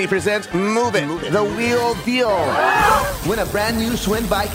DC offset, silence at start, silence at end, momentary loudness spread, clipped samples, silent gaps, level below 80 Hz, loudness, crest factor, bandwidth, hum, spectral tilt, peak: under 0.1%; 0 s; 0 s; 6 LU; under 0.1%; none; -36 dBFS; -18 LUFS; 14 dB; 16 kHz; none; -4.5 dB/octave; -4 dBFS